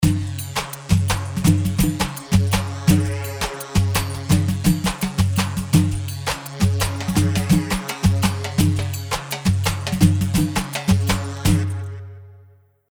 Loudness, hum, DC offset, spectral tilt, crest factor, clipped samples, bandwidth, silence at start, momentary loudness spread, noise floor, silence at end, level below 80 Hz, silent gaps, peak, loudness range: -21 LUFS; none; under 0.1%; -5.5 dB/octave; 18 dB; under 0.1%; over 20 kHz; 0 s; 8 LU; -51 dBFS; 0.5 s; -34 dBFS; none; -2 dBFS; 1 LU